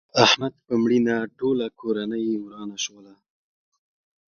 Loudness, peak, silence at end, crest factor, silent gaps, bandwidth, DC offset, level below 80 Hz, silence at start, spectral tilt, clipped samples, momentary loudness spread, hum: -23 LUFS; 0 dBFS; 1.45 s; 24 dB; none; 7 kHz; under 0.1%; -64 dBFS; 0.15 s; -4 dB/octave; under 0.1%; 13 LU; none